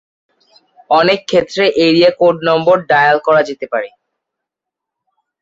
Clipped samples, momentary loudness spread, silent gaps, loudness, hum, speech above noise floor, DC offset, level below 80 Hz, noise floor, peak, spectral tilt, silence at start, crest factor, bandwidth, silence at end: under 0.1%; 10 LU; none; -12 LUFS; none; 70 dB; under 0.1%; -56 dBFS; -82 dBFS; 0 dBFS; -5.5 dB/octave; 0.9 s; 14 dB; 7.8 kHz; 1.55 s